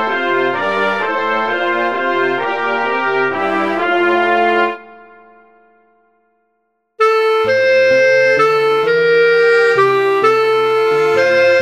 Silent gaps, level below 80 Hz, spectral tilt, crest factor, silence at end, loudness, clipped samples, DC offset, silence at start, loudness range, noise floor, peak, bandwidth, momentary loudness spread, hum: none; -64 dBFS; -4.5 dB/octave; 14 dB; 0 s; -13 LUFS; under 0.1%; under 0.1%; 0 s; 7 LU; -66 dBFS; 0 dBFS; 10.5 kHz; 6 LU; none